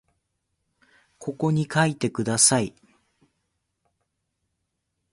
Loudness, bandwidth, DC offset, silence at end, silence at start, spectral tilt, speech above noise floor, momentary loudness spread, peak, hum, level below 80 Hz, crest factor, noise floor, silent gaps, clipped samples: -22 LUFS; 11.5 kHz; under 0.1%; 2.45 s; 1.2 s; -3.5 dB/octave; 56 dB; 17 LU; -2 dBFS; none; -62 dBFS; 26 dB; -78 dBFS; none; under 0.1%